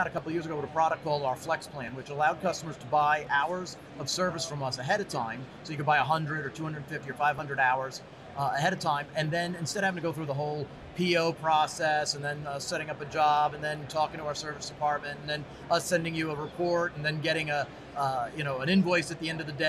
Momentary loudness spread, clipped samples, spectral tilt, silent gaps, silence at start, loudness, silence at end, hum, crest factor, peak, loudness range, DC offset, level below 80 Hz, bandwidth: 10 LU; under 0.1%; -4.5 dB/octave; none; 0 s; -30 LUFS; 0 s; none; 16 dB; -14 dBFS; 2 LU; under 0.1%; -62 dBFS; 13.5 kHz